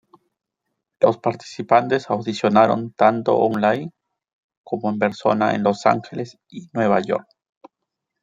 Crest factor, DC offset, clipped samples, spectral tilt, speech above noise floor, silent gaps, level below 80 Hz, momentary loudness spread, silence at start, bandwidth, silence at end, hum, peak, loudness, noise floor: 20 dB; under 0.1%; under 0.1%; -6.5 dB/octave; 61 dB; 4.33-4.49 s, 4.57-4.64 s; -66 dBFS; 14 LU; 1 s; 7.8 kHz; 1 s; none; -2 dBFS; -20 LUFS; -80 dBFS